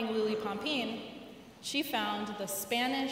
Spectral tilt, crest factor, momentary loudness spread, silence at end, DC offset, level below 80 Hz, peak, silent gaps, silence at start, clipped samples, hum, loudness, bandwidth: -3 dB/octave; 18 dB; 13 LU; 0 s; under 0.1%; -72 dBFS; -18 dBFS; none; 0 s; under 0.1%; none; -34 LUFS; 16 kHz